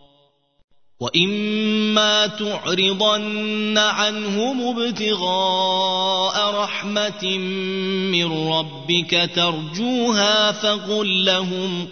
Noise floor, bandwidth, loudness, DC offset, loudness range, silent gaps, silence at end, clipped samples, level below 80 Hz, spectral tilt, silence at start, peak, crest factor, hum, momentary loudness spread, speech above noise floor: -60 dBFS; 6.6 kHz; -19 LUFS; 0.3%; 2 LU; none; 0 s; under 0.1%; -66 dBFS; -3.5 dB/octave; 1 s; -2 dBFS; 18 dB; none; 6 LU; 39 dB